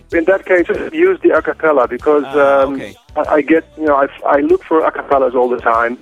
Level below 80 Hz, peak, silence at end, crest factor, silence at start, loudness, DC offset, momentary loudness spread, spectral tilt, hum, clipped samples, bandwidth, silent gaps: -44 dBFS; -2 dBFS; 0.05 s; 12 dB; 0.1 s; -13 LUFS; under 0.1%; 3 LU; -6.5 dB/octave; none; under 0.1%; 10 kHz; none